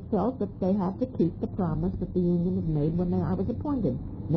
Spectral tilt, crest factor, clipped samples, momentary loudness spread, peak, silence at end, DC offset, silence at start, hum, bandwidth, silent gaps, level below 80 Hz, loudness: -12 dB/octave; 12 dB; under 0.1%; 4 LU; -14 dBFS; 0 s; under 0.1%; 0 s; none; 5.4 kHz; none; -42 dBFS; -28 LUFS